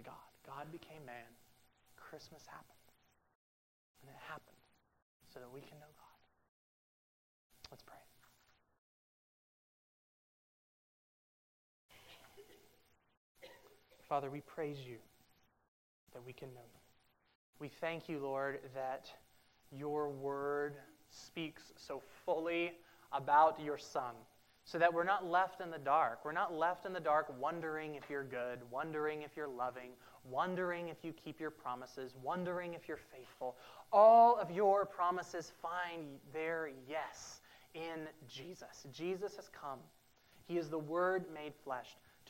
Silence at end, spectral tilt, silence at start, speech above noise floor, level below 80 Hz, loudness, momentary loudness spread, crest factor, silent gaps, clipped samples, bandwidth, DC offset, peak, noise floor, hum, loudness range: 0 s; -5.5 dB/octave; 0 s; 35 dB; -80 dBFS; -38 LUFS; 23 LU; 24 dB; 3.35-3.95 s, 5.02-5.20 s, 6.48-7.50 s, 8.78-11.89 s, 13.17-13.35 s, 15.68-16.07 s, 17.35-17.53 s; under 0.1%; 16 kHz; under 0.1%; -16 dBFS; -73 dBFS; none; 26 LU